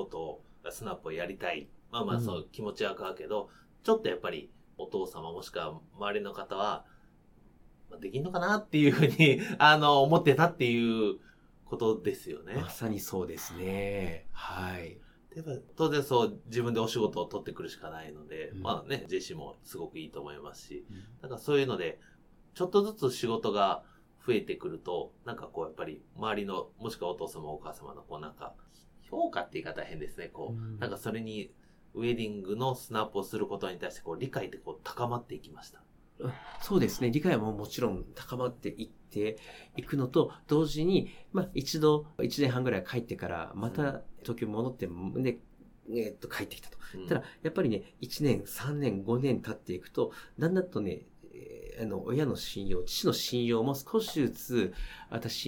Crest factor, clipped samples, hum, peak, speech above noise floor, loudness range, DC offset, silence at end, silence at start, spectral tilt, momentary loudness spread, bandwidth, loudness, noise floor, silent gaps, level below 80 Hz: 26 dB; under 0.1%; none; -6 dBFS; 28 dB; 12 LU; under 0.1%; 0 s; 0 s; -5.5 dB/octave; 16 LU; 19 kHz; -32 LUFS; -60 dBFS; none; -54 dBFS